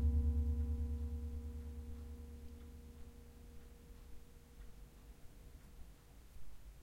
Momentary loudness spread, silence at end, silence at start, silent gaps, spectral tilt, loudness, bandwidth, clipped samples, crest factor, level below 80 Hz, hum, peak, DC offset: 22 LU; 0 s; 0 s; none; -8 dB/octave; -44 LUFS; 12.5 kHz; under 0.1%; 18 dB; -46 dBFS; none; -26 dBFS; under 0.1%